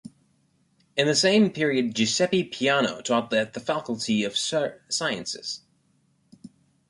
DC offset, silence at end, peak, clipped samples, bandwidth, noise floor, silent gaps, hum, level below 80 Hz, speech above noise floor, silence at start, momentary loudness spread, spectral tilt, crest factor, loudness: under 0.1%; 0.45 s; -8 dBFS; under 0.1%; 11.5 kHz; -66 dBFS; none; none; -68 dBFS; 42 dB; 0.95 s; 10 LU; -3.5 dB/octave; 18 dB; -24 LUFS